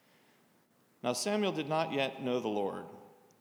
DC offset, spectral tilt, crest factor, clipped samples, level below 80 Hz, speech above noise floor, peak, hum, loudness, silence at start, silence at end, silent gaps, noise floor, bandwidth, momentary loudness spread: under 0.1%; -4 dB/octave; 18 dB; under 0.1%; -88 dBFS; 35 dB; -18 dBFS; none; -34 LUFS; 1.05 s; 0.3 s; none; -69 dBFS; over 20 kHz; 12 LU